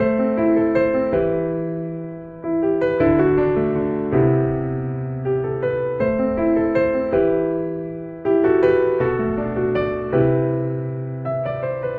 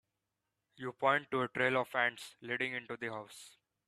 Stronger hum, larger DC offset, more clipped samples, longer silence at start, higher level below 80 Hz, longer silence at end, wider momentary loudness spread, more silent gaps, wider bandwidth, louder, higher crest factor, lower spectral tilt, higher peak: neither; neither; neither; second, 0 s vs 0.8 s; first, -42 dBFS vs -80 dBFS; second, 0 s vs 0.4 s; second, 9 LU vs 15 LU; neither; second, 4.6 kHz vs 14.5 kHz; first, -20 LUFS vs -34 LUFS; second, 16 dB vs 22 dB; first, -11 dB/octave vs -4.5 dB/octave; first, -4 dBFS vs -14 dBFS